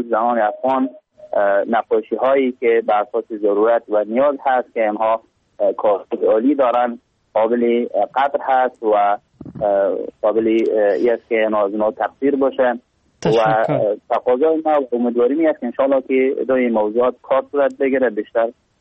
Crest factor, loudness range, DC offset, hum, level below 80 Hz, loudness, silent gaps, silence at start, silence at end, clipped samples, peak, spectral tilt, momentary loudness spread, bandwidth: 12 dB; 1 LU; under 0.1%; none; -62 dBFS; -18 LUFS; none; 0 s; 0.3 s; under 0.1%; -6 dBFS; -7 dB/octave; 5 LU; 7.8 kHz